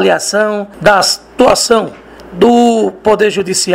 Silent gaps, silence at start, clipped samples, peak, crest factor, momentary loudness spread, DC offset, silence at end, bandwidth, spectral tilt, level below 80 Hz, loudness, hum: none; 0 s; 0.4%; 0 dBFS; 10 dB; 5 LU; under 0.1%; 0 s; 16.5 kHz; -3 dB/octave; -42 dBFS; -11 LUFS; none